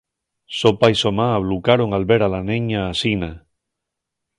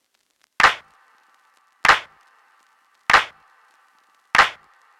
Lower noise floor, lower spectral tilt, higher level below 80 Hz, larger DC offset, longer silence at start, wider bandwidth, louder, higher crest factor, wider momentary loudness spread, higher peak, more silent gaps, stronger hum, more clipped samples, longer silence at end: first, -81 dBFS vs -66 dBFS; first, -6 dB/octave vs -0.5 dB/octave; first, -42 dBFS vs -52 dBFS; neither; about the same, 0.5 s vs 0.6 s; second, 11 kHz vs 17.5 kHz; about the same, -18 LUFS vs -18 LUFS; about the same, 20 dB vs 18 dB; second, 7 LU vs 12 LU; first, 0 dBFS vs -6 dBFS; neither; neither; neither; first, 1 s vs 0.45 s